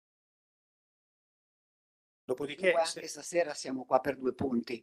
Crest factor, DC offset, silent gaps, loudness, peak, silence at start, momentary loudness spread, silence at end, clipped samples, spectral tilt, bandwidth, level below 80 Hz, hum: 24 dB; under 0.1%; none; -32 LUFS; -10 dBFS; 2.3 s; 10 LU; 0.05 s; under 0.1%; -4 dB/octave; 12.5 kHz; -72 dBFS; none